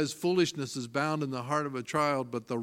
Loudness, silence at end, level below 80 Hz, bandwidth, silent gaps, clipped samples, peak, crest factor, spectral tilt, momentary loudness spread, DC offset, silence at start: -31 LUFS; 0 s; -74 dBFS; 16.5 kHz; none; under 0.1%; -14 dBFS; 18 dB; -5 dB/octave; 6 LU; under 0.1%; 0 s